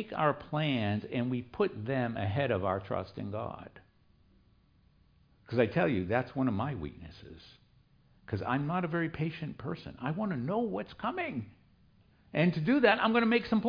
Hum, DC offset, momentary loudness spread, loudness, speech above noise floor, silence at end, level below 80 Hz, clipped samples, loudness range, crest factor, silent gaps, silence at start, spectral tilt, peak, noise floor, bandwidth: none; under 0.1%; 14 LU; -32 LUFS; 34 dB; 0 s; -62 dBFS; under 0.1%; 6 LU; 20 dB; none; 0 s; -9 dB/octave; -12 dBFS; -65 dBFS; 5.2 kHz